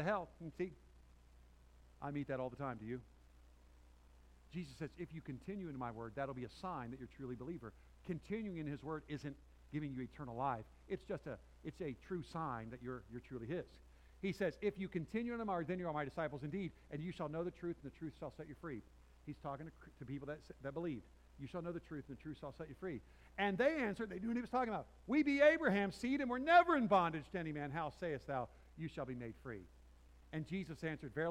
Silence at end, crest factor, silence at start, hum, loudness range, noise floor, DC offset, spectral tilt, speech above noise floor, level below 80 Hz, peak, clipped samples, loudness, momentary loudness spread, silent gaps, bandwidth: 0 s; 24 dB; 0 s; none; 14 LU; -64 dBFS; under 0.1%; -7 dB/octave; 23 dB; -64 dBFS; -18 dBFS; under 0.1%; -42 LUFS; 15 LU; none; 14.5 kHz